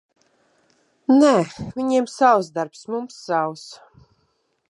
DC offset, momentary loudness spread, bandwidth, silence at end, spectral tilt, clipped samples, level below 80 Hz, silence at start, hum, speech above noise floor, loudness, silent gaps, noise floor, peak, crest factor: under 0.1%; 14 LU; 11.5 kHz; 0.95 s; -5.5 dB/octave; under 0.1%; -60 dBFS; 1.1 s; none; 48 dB; -20 LUFS; none; -68 dBFS; -2 dBFS; 18 dB